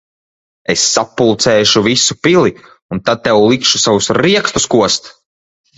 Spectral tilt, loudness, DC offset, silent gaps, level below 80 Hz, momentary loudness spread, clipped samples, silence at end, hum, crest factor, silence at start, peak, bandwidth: -3 dB/octave; -11 LUFS; under 0.1%; 2.82-2.89 s; -46 dBFS; 7 LU; under 0.1%; 0.7 s; none; 14 dB; 0.7 s; 0 dBFS; 8.4 kHz